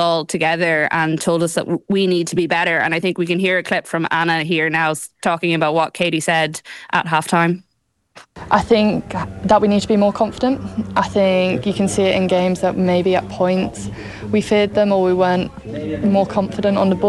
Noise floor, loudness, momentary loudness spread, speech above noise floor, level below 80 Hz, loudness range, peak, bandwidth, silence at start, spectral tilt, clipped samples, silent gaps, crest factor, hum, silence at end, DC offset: -68 dBFS; -17 LUFS; 6 LU; 51 dB; -46 dBFS; 2 LU; -2 dBFS; 13 kHz; 0 s; -5.5 dB/octave; under 0.1%; none; 16 dB; none; 0 s; under 0.1%